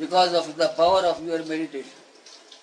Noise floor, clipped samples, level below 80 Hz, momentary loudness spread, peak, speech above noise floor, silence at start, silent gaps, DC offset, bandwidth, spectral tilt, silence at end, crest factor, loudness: -48 dBFS; under 0.1%; -62 dBFS; 15 LU; -8 dBFS; 26 dB; 0 s; none; under 0.1%; 10.5 kHz; -3.5 dB/octave; 0.05 s; 16 dB; -23 LUFS